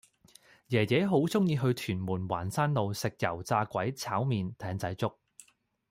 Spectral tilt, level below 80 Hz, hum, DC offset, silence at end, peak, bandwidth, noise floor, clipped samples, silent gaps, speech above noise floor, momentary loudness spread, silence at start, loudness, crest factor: -6 dB/octave; -66 dBFS; none; under 0.1%; 0.8 s; -14 dBFS; 16.5 kHz; -65 dBFS; under 0.1%; none; 35 dB; 8 LU; 0.7 s; -31 LUFS; 16 dB